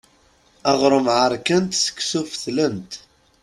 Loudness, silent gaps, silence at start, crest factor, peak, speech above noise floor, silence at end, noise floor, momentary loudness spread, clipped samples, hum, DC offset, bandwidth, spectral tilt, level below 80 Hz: -20 LUFS; none; 0.65 s; 18 dB; -2 dBFS; 37 dB; 0.45 s; -57 dBFS; 12 LU; under 0.1%; none; under 0.1%; 13 kHz; -3.5 dB/octave; -58 dBFS